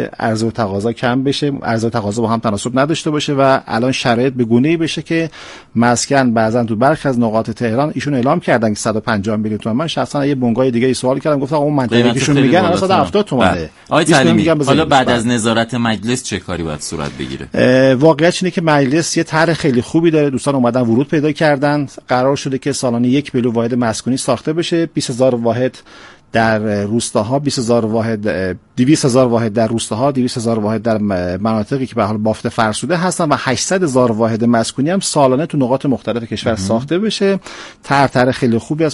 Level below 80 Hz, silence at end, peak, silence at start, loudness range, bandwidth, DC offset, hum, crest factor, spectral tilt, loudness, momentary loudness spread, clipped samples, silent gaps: -46 dBFS; 0 s; 0 dBFS; 0 s; 4 LU; 11.5 kHz; under 0.1%; none; 14 dB; -5.5 dB/octave; -15 LUFS; 6 LU; under 0.1%; none